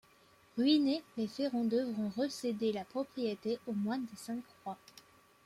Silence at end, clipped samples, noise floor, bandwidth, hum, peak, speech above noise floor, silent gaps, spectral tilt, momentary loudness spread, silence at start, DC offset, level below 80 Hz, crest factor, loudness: 0.45 s; under 0.1%; -65 dBFS; 15 kHz; none; -18 dBFS; 30 dB; none; -5.5 dB/octave; 14 LU; 0.55 s; under 0.1%; -78 dBFS; 18 dB; -35 LUFS